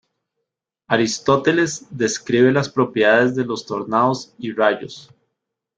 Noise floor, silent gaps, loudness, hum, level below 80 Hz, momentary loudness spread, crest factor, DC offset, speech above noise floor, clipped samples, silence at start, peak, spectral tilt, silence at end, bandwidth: -80 dBFS; none; -19 LUFS; none; -60 dBFS; 10 LU; 18 dB; under 0.1%; 62 dB; under 0.1%; 0.9 s; -2 dBFS; -4.5 dB/octave; 0.75 s; 9.4 kHz